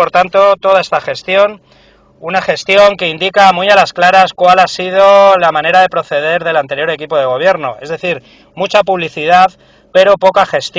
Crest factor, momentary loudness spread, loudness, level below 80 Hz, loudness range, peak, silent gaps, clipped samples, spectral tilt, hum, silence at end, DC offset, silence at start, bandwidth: 10 dB; 9 LU; -10 LUFS; -50 dBFS; 5 LU; 0 dBFS; none; 1%; -4 dB/octave; none; 0 s; under 0.1%; 0 s; 8 kHz